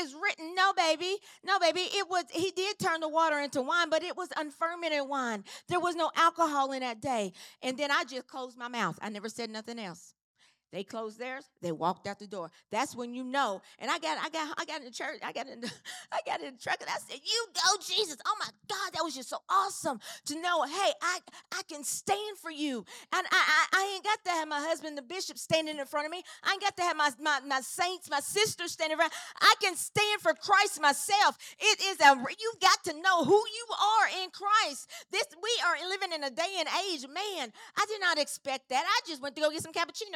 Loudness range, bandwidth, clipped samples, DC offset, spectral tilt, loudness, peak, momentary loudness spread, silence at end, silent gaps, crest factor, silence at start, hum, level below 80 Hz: 10 LU; 18 kHz; under 0.1%; under 0.1%; -1.5 dB/octave; -30 LUFS; -6 dBFS; 13 LU; 0 s; 10.24-10.35 s; 24 dB; 0 s; none; -84 dBFS